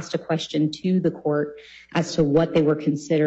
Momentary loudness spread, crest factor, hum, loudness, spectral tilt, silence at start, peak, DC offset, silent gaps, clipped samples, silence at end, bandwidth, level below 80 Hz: 7 LU; 14 dB; none; -23 LUFS; -6.5 dB/octave; 0 s; -8 dBFS; under 0.1%; none; under 0.1%; 0 s; 8.2 kHz; -54 dBFS